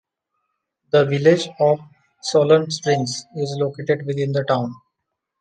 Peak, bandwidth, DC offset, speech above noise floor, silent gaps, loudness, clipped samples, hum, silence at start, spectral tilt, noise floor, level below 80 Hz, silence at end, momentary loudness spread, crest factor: -2 dBFS; 9.4 kHz; under 0.1%; 61 dB; none; -20 LUFS; under 0.1%; none; 0.95 s; -5.5 dB/octave; -79 dBFS; -66 dBFS; 0.65 s; 11 LU; 18 dB